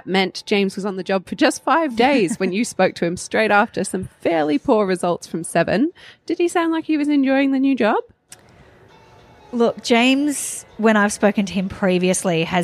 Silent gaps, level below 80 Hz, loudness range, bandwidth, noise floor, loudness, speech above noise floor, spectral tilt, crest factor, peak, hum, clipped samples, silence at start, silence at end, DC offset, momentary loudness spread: none; -56 dBFS; 2 LU; 14.5 kHz; -48 dBFS; -19 LUFS; 30 dB; -4.5 dB/octave; 18 dB; -2 dBFS; none; under 0.1%; 0.05 s; 0 s; under 0.1%; 8 LU